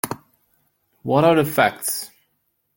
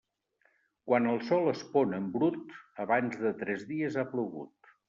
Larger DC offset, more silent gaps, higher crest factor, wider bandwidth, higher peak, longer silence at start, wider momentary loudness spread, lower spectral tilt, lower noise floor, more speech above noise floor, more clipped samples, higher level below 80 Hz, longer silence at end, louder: neither; neither; about the same, 20 dB vs 20 dB; first, 17 kHz vs 7.4 kHz; first, -2 dBFS vs -12 dBFS; second, 0.05 s vs 0.85 s; first, 19 LU vs 15 LU; about the same, -4.5 dB/octave vs -5.5 dB/octave; about the same, -70 dBFS vs -73 dBFS; first, 52 dB vs 42 dB; neither; first, -60 dBFS vs -76 dBFS; first, 0.7 s vs 0.4 s; first, -19 LUFS vs -31 LUFS